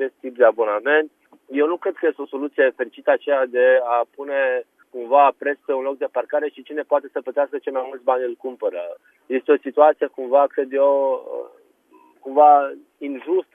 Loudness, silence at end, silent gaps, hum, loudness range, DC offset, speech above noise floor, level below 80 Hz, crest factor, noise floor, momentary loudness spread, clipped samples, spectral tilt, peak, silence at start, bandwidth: -20 LUFS; 0.15 s; none; none; 5 LU; under 0.1%; 35 dB; -86 dBFS; 18 dB; -54 dBFS; 14 LU; under 0.1%; -5.5 dB/octave; -2 dBFS; 0 s; 3.7 kHz